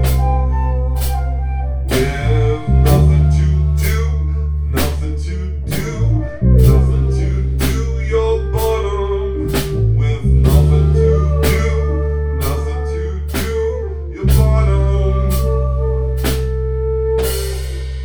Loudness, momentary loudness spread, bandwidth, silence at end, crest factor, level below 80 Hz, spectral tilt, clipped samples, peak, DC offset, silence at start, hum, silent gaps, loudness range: -16 LUFS; 9 LU; over 20 kHz; 0 s; 14 dB; -18 dBFS; -7 dB/octave; under 0.1%; 0 dBFS; under 0.1%; 0 s; none; none; 3 LU